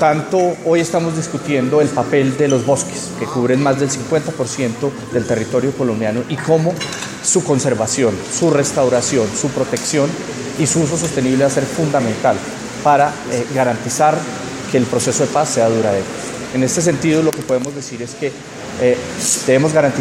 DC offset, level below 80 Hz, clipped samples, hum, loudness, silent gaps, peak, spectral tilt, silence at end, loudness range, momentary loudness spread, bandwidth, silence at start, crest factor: under 0.1%; -50 dBFS; under 0.1%; none; -17 LUFS; none; 0 dBFS; -4.5 dB/octave; 0 s; 2 LU; 8 LU; 16.5 kHz; 0 s; 16 dB